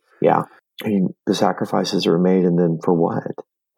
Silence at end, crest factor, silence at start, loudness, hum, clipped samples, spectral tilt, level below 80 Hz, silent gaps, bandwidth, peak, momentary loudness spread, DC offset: 0.35 s; 18 dB; 0.2 s; -19 LUFS; none; under 0.1%; -6.5 dB/octave; -72 dBFS; none; 14.5 kHz; -2 dBFS; 12 LU; under 0.1%